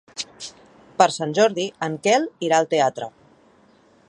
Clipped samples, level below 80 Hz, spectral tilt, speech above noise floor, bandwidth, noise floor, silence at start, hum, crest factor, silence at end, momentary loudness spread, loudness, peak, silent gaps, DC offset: under 0.1%; -70 dBFS; -3.5 dB/octave; 35 dB; 11 kHz; -55 dBFS; 0.15 s; none; 22 dB; 1 s; 17 LU; -21 LUFS; 0 dBFS; none; under 0.1%